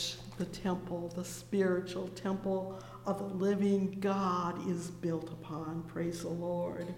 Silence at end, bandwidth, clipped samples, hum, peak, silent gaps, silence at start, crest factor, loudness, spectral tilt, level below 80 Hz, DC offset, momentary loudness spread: 0 s; 16.5 kHz; under 0.1%; none; -20 dBFS; none; 0 s; 16 dB; -36 LUFS; -6 dB/octave; -62 dBFS; under 0.1%; 9 LU